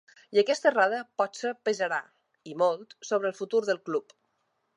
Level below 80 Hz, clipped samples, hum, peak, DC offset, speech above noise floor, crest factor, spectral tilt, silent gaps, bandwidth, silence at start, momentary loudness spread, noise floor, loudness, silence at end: -88 dBFS; under 0.1%; none; -8 dBFS; under 0.1%; 48 dB; 20 dB; -3.5 dB/octave; none; 11 kHz; 0.3 s; 10 LU; -76 dBFS; -28 LUFS; 0.75 s